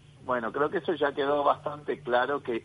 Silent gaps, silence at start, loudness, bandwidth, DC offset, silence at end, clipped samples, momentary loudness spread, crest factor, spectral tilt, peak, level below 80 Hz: none; 0.25 s; -28 LUFS; 10.5 kHz; under 0.1%; 0 s; under 0.1%; 6 LU; 18 dB; -6.5 dB/octave; -10 dBFS; -66 dBFS